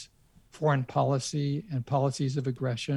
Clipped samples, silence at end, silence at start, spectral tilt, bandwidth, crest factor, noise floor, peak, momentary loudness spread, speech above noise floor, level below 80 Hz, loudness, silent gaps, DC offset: under 0.1%; 0 s; 0 s; -6 dB/octave; 11.5 kHz; 18 dB; -60 dBFS; -12 dBFS; 5 LU; 31 dB; -64 dBFS; -29 LUFS; none; under 0.1%